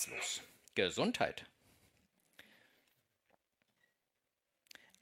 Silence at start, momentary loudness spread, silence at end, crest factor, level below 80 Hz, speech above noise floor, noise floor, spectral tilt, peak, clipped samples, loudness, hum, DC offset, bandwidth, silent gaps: 0 s; 25 LU; 3.55 s; 26 dB; -78 dBFS; 50 dB; -88 dBFS; -2.5 dB/octave; -18 dBFS; under 0.1%; -38 LUFS; none; under 0.1%; 16.5 kHz; none